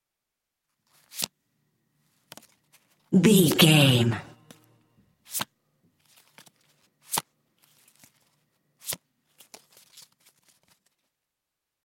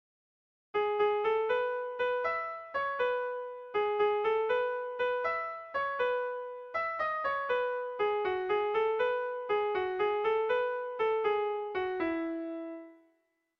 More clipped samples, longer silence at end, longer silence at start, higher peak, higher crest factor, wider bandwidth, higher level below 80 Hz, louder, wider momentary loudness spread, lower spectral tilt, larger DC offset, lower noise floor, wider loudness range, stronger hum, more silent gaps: neither; first, 2.9 s vs 0.65 s; first, 1.15 s vs 0.75 s; first, -4 dBFS vs -18 dBFS; first, 24 dB vs 14 dB; first, 17 kHz vs 6 kHz; about the same, -68 dBFS vs -70 dBFS; first, -23 LUFS vs -32 LUFS; first, 19 LU vs 7 LU; about the same, -4.5 dB/octave vs -5.5 dB/octave; neither; first, -85 dBFS vs -75 dBFS; first, 21 LU vs 2 LU; neither; neither